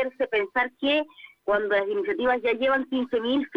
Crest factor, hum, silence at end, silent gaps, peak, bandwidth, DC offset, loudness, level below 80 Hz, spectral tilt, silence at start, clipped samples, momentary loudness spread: 16 dB; none; 0 s; none; -10 dBFS; 6 kHz; under 0.1%; -25 LUFS; -60 dBFS; -5.5 dB/octave; 0 s; under 0.1%; 4 LU